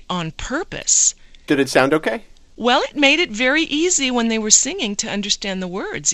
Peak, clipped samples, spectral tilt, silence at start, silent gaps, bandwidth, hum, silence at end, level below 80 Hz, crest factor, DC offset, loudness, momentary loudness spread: 0 dBFS; under 0.1%; -1.5 dB/octave; 0 s; none; 15 kHz; none; 0 s; -44 dBFS; 18 dB; under 0.1%; -17 LUFS; 12 LU